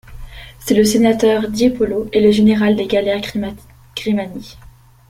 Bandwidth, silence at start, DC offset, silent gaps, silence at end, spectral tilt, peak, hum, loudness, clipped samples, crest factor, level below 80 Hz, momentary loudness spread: 16 kHz; 0.1 s; under 0.1%; none; 0.45 s; -5.5 dB/octave; -2 dBFS; none; -15 LUFS; under 0.1%; 14 dB; -40 dBFS; 17 LU